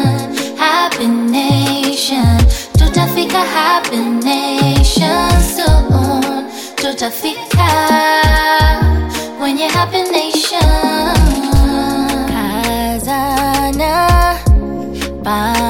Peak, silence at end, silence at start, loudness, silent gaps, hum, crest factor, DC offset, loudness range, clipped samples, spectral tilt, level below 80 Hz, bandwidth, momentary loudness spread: 0 dBFS; 0 s; 0 s; -13 LUFS; none; none; 12 dB; under 0.1%; 2 LU; under 0.1%; -5 dB/octave; -18 dBFS; 17 kHz; 7 LU